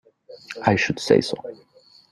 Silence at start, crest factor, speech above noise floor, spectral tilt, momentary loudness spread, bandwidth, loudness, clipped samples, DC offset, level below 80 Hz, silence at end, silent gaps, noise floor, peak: 0.3 s; 22 dB; 21 dB; -5 dB/octave; 18 LU; 12 kHz; -21 LUFS; under 0.1%; under 0.1%; -56 dBFS; 0.6 s; none; -42 dBFS; -2 dBFS